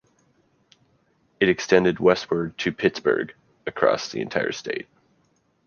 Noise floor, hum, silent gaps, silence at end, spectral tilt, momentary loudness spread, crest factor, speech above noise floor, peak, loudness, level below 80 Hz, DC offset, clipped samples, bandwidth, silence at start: -66 dBFS; none; none; 0.85 s; -5 dB/octave; 14 LU; 22 dB; 44 dB; -2 dBFS; -23 LUFS; -58 dBFS; under 0.1%; under 0.1%; 7 kHz; 1.4 s